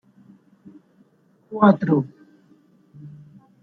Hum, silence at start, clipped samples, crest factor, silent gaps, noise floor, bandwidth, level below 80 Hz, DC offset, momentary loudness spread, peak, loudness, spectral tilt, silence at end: none; 1.5 s; under 0.1%; 22 dB; none; -59 dBFS; 4.4 kHz; -68 dBFS; under 0.1%; 27 LU; -2 dBFS; -19 LUFS; -10.5 dB/octave; 0.55 s